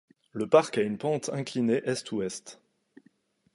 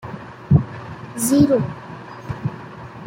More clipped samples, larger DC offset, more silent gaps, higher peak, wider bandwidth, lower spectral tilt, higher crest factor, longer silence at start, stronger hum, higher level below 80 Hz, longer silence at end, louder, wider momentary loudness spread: neither; neither; neither; second, -6 dBFS vs -2 dBFS; second, 11.5 kHz vs 16 kHz; second, -5 dB/octave vs -6.5 dB/octave; about the same, 22 dB vs 18 dB; first, 0.35 s vs 0.05 s; neither; second, -72 dBFS vs -44 dBFS; first, 1 s vs 0 s; second, -28 LUFS vs -19 LUFS; second, 16 LU vs 20 LU